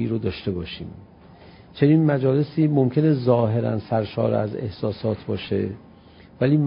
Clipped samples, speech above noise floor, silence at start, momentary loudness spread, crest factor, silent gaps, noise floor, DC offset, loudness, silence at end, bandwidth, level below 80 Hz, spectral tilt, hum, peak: under 0.1%; 27 dB; 0 s; 12 LU; 18 dB; none; -48 dBFS; under 0.1%; -22 LUFS; 0 s; 5.4 kHz; -48 dBFS; -12.5 dB/octave; none; -4 dBFS